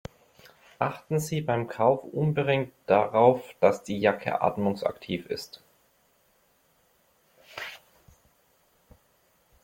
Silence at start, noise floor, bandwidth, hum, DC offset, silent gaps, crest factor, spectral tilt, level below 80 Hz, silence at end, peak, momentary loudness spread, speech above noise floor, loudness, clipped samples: 0.8 s; -66 dBFS; 16.5 kHz; none; under 0.1%; none; 22 dB; -6.5 dB/octave; -64 dBFS; 1.85 s; -6 dBFS; 17 LU; 41 dB; -26 LUFS; under 0.1%